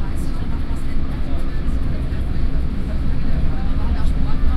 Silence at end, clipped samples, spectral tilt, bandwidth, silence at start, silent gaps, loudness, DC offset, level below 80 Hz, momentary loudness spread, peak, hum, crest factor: 0 s; under 0.1%; -8 dB/octave; 5 kHz; 0 s; none; -25 LUFS; under 0.1%; -20 dBFS; 4 LU; -6 dBFS; none; 10 dB